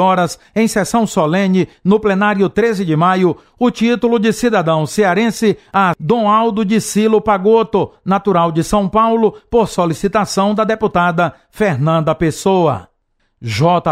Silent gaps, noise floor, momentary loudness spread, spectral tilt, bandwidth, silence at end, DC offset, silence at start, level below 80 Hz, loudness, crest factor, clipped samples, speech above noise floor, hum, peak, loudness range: none; -63 dBFS; 5 LU; -6 dB/octave; 15.5 kHz; 0 s; under 0.1%; 0 s; -42 dBFS; -14 LUFS; 14 dB; under 0.1%; 49 dB; none; 0 dBFS; 2 LU